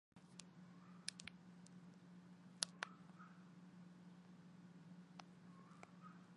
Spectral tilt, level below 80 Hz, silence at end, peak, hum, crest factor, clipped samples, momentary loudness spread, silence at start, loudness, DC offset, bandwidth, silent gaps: -2.5 dB/octave; under -90 dBFS; 0 s; -18 dBFS; none; 40 dB; under 0.1%; 16 LU; 0.15 s; -56 LUFS; under 0.1%; 11 kHz; none